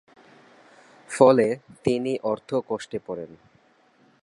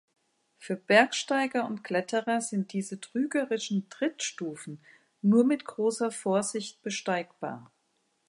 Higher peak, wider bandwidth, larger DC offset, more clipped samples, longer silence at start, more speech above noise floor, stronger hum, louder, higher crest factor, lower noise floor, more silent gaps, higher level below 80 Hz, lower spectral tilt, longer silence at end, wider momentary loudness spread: first, -4 dBFS vs -8 dBFS; about the same, 11.5 kHz vs 11.5 kHz; neither; neither; first, 1.1 s vs 0.6 s; second, 37 dB vs 45 dB; neither; first, -23 LUFS vs -29 LUFS; about the same, 22 dB vs 22 dB; second, -60 dBFS vs -74 dBFS; neither; first, -64 dBFS vs -82 dBFS; first, -6 dB/octave vs -4.5 dB/octave; first, 0.95 s vs 0.7 s; first, 19 LU vs 15 LU